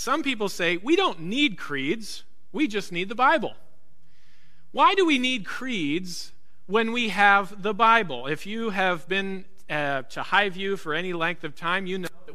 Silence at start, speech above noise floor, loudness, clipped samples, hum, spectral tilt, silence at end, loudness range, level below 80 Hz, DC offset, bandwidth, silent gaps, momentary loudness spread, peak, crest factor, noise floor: 0 s; 40 dB; -24 LUFS; under 0.1%; none; -4 dB/octave; 0 s; 4 LU; -62 dBFS; 2%; 14.5 kHz; none; 13 LU; -4 dBFS; 22 dB; -64 dBFS